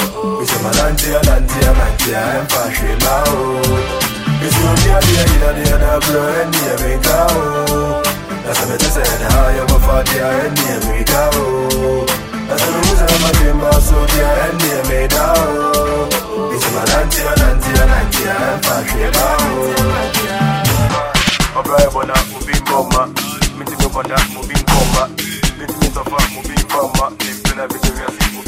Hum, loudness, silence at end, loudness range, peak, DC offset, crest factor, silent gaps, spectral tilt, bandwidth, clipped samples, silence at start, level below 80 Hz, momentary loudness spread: none; -14 LUFS; 0 s; 3 LU; 0 dBFS; under 0.1%; 14 dB; none; -4 dB/octave; 16.5 kHz; under 0.1%; 0 s; -18 dBFS; 6 LU